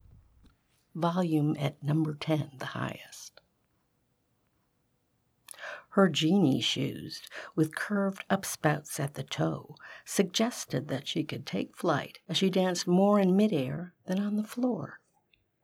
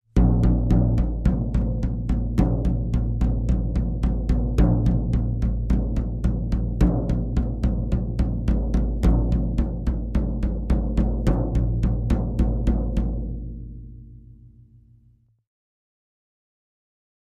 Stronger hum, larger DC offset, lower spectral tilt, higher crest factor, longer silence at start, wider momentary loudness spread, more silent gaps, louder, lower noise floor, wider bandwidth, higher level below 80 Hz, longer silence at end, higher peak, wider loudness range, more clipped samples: neither; neither; second, -5.5 dB/octave vs -9.5 dB/octave; about the same, 20 dB vs 16 dB; first, 0.95 s vs 0.15 s; first, 16 LU vs 6 LU; neither; second, -30 LUFS vs -24 LUFS; first, -74 dBFS vs -58 dBFS; first, 16.5 kHz vs 5.4 kHz; second, -70 dBFS vs -24 dBFS; second, 0.65 s vs 2.95 s; second, -10 dBFS vs -6 dBFS; first, 8 LU vs 5 LU; neither